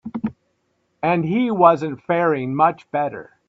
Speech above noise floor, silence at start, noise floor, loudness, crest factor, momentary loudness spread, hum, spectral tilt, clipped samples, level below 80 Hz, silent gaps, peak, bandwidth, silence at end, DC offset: 49 dB; 0.05 s; -68 dBFS; -20 LUFS; 20 dB; 13 LU; none; -8.5 dB/octave; under 0.1%; -62 dBFS; none; 0 dBFS; 7.6 kHz; 0.25 s; under 0.1%